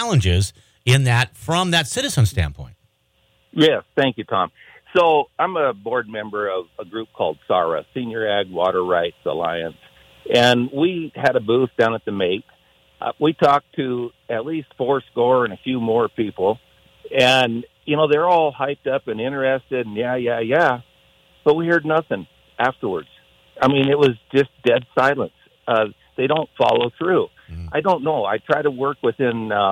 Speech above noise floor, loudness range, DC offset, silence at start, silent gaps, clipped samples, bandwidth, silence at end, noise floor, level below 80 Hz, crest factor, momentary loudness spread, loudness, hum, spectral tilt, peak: 43 dB; 3 LU; under 0.1%; 0 s; none; under 0.1%; 16.5 kHz; 0 s; -63 dBFS; -46 dBFS; 16 dB; 11 LU; -20 LUFS; none; -5.5 dB/octave; -4 dBFS